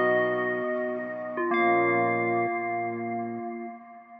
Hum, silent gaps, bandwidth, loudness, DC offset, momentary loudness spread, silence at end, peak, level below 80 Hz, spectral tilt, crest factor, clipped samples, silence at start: none; none; 5.2 kHz; -27 LUFS; under 0.1%; 13 LU; 0 s; -12 dBFS; -84 dBFS; -9.5 dB/octave; 14 dB; under 0.1%; 0 s